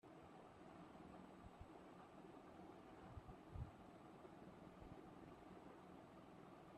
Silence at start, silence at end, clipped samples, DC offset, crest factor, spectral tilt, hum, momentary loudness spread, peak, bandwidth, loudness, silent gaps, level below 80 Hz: 0.05 s; 0 s; under 0.1%; under 0.1%; 20 dB; -7 dB/octave; none; 4 LU; -40 dBFS; 12 kHz; -62 LUFS; none; -70 dBFS